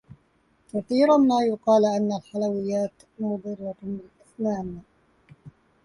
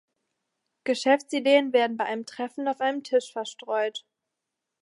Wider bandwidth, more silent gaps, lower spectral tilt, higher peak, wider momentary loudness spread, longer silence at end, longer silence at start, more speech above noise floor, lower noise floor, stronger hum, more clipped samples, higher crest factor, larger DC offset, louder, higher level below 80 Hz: about the same, 11 kHz vs 11.5 kHz; neither; first, -6.5 dB/octave vs -3 dB/octave; about the same, -8 dBFS vs -8 dBFS; first, 16 LU vs 13 LU; second, 0.35 s vs 0.8 s; about the same, 0.75 s vs 0.85 s; second, 41 dB vs 59 dB; second, -65 dBFS vs -85 dBFS; neither; neither; about the same, 16 dB vs 20 dB; neither; about the same, -24 LUFS vs -26 LUFS; first, -62 dBFS vs -86 dBFS